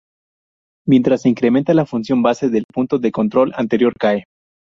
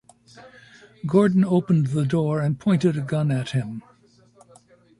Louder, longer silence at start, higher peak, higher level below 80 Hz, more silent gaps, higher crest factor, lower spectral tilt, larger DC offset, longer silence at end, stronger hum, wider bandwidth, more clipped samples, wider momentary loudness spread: first, -16 LUFS vs -22 LUFS; first, 0.85 s vs 0.35 s; first, -2 dBFS vs -6 dBFS; about the same, -56 dBFS vs -60 dBFS; first, 2.64-2.69 s vs none; about the same, 14 dB vs 18 dB; about the same, -7.5 dB/octave vs -8 dB/octave; neither; second, 0.45 s vs 1.2 s; neither; second, 7.4 kHz vs 11 kHz; neither; second, 5 LU vs 9 LU